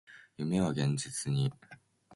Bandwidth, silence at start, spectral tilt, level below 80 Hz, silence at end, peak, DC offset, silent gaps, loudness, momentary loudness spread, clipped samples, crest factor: 11.5 kHz; 0.1 s; -5.5 dB/octave; -62 dBFS; 0 s; -18 dBFS; under 0.1%; none; -33 LUFS; 8 LU; under 0.1%; 16 dB